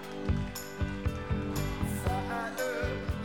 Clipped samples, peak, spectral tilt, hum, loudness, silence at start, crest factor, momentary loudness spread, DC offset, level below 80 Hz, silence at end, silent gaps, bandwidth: under 0.1%; -18 dBFS; -6 dB/octave; none; -34 LUFS; 0 s; 14 dB; 3 LU; 0.2%; -40 dBFS; 0 s; none; 19.5 kHz